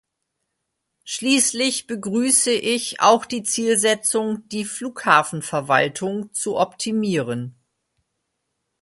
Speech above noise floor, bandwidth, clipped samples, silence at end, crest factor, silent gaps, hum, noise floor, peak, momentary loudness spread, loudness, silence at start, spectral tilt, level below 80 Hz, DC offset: 57 dB; 12 kHz; under 0.1%; 1.3 s; 20 dB; none; none; -78 dBFS; -2 dBFS; 10 LU; -20 LUFS; 1.05 s; -2.5 dB/octave; -66 dBFS; under 0.1%